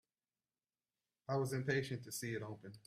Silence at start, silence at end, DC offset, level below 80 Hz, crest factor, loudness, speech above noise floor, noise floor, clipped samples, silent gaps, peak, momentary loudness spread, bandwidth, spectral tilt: 1.3 s; 0.1 s; under 0.1%; -78 dBFS; 20 dB; -41 LUFS; over 49 dB; under -90 dBFS; under 0.1%; none; -24 dBFS; 10 LU; 15.5 kHz; -5 dB/octave